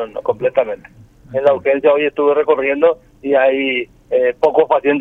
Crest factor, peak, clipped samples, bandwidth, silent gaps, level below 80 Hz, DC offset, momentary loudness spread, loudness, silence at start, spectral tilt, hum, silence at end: 14 dB; 0 dBFS; under 0.1%; 4.6 kHz; none; -54 dBFS; under 0.1%; 8 LU; -15 LUFS; 0 s; -7 dB/octave; none; 0 s